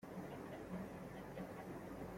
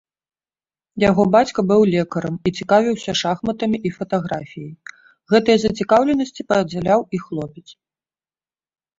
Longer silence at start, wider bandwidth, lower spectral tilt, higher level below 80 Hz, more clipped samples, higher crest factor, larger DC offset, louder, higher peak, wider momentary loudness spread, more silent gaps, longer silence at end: second, 0 s vs 0.95 s; first, 16.5 kHz vs 7.8 kHz; about the same, -7 dB/octave vs -6 dB/octave; second, -66 dBFS vs -52 dBFS; neither; second, 12 dB vs 18 dB; neither; second, -51 LUFS vs -18 LUFS; second, -38 dBFS vs -2 dBFS; second, 2 LU vs 14 LU; neither; second, 0 s vs 1.3 s